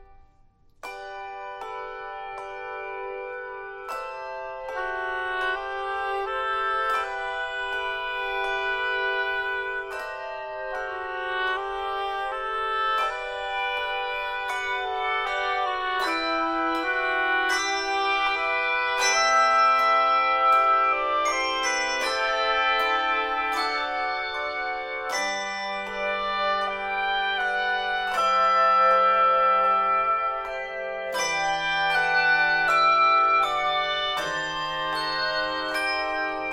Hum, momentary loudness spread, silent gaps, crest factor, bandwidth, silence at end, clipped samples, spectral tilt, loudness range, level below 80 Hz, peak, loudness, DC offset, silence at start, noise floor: none; 15 LU; none; 16 dB; 16 kHz; 0 s; under 0.1%; -1 dB/octave; 9 LU; -54 dBFS; -10 dBFS; -24 LUFS; under 0.1%; 0 s; -57 dBFS